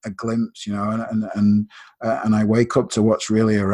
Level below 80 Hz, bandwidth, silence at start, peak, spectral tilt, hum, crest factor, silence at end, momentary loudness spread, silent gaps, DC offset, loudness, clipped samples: -50 dBFS; 10.5 kHz; 0.05 s; -4 dBFS; -6.5 dB/octave; none; 16 dB; 0 s; 8 LU; none; under 0.1%; -20 LUFS; under 0.1%